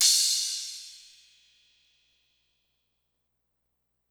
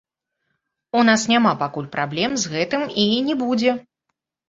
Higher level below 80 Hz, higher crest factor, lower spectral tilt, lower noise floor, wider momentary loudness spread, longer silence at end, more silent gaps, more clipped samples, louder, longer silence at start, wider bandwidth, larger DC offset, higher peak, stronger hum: second, -84 dBFS vs -62 dBFS; first, 26 dB vs 20 dB; second, 7.5 dB/octave vs -4 dB/octave; about the same, -79 dBFS vs -78 dBFS; first, 25 LU vs 9 LU; first, 3.15 s vs 0.7 s; neither; neither; second, -24 LUFS vs -20 LUFS; second, 0 s vs 0.95 s; first, over 20 kHz vs 7.8 kHz; neither; second, -8 dBFS vs -2 dBFS; first, 60 Hz at -85 dBFS vs none